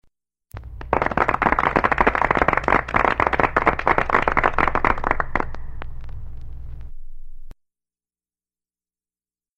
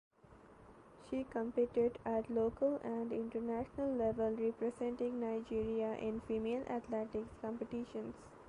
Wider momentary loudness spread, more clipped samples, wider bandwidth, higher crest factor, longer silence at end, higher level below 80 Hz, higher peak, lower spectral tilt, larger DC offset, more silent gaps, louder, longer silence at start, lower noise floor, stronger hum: first, 21 LU vs 8 LU; neither; second, 8.4 kHz vs 10.5 kHz; first, 22 dB vs 14 dB; first, 2.05 s vs 0 s; first, -32 dBFS vs -64 dBFS; first, 0 dBFS vs -24 dBFS; about the same, -6.5 dB/octave vs -7.5 dB/octave; neither; neither; first, -20 LUFS vs -39 LUFS; first, 0.55 s vs 0.3 s; first, under -90 dBFS vs -61 dBFS; first, 60 Hz at -40 dBFS vs none